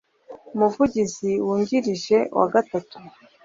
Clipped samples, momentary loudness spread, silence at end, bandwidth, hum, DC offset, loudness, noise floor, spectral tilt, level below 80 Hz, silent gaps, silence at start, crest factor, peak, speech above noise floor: under 0.1%; 7 LU; 0.35 s; 7.8 kHz; none; under 0.1%; -22 LUFS; -45 dBFS; -5.5 dB/octave; -58 dBFS; none; 0.3 s; 18 dB; -4 dBFS; 23 dB